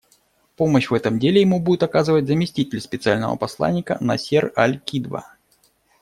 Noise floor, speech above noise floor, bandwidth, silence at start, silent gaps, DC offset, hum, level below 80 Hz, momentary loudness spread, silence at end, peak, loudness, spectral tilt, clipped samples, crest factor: -61 dBFS; 42 dB; 14.5 kHz; 0.6 s; none; under 0.1%; none; -56 dBFS; 9 LU; 0.8 s; -2 dBFS; -20 LUFS; -6.5 dB/octave; under 0.1%; 18 dB